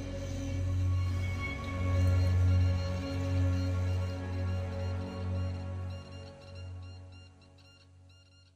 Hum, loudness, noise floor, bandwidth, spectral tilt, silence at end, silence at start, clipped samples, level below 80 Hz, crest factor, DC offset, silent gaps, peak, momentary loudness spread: none; -33 LUFS; -59 dBFS; 8.4 kHz; -7 dB/octave; 0.45 s; 0 s; under 0.1%; -46 dBFS; 14 dB; under 0.1%; none; -18 dBFS; 19 LU